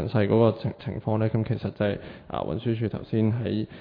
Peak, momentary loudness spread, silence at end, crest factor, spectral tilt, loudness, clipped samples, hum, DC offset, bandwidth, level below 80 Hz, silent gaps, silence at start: -8 dBFS; 11 LU; 0 s; 16 dB; -11 dB/octave; -27 LUFS; under 0.1%; none; under 0.1%; 5 kHz; -52 dBFS; none; 0 s